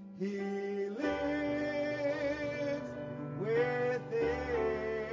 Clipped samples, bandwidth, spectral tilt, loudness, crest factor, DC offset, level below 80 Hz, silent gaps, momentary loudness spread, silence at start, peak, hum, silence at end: under 0.1%; 7.6 kHz; -7 dB/octave; -35 LUFS; 14 dB; under 0.1%; -56 dBFS; none; 7 LU; 0 s; -20 dBFS; none; 0 s